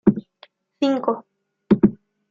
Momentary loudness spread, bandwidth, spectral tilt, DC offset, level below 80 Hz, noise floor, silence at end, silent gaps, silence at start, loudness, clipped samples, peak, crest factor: 11 LU; 7.2 kHz; -8.5 dB/octave; under 0.1%; -50 dBFS; -53 dBFS; 0.35 s; none; 0.05 s; -21 LUFS; under 0.1%; -2 dBFS; 20 dB